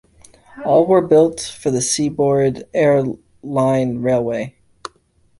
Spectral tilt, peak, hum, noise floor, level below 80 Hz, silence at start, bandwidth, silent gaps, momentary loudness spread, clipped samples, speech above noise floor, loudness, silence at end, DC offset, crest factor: -5.5 dB/octave; -2 dBFS; none; -57 dBFS; -52 dBFS; 0.55 s; 11.5 kHz; none; 19 LU; under 0.1%; 41 dB; -17 LUFS; 0.9 s; under 0.1%; 16 dB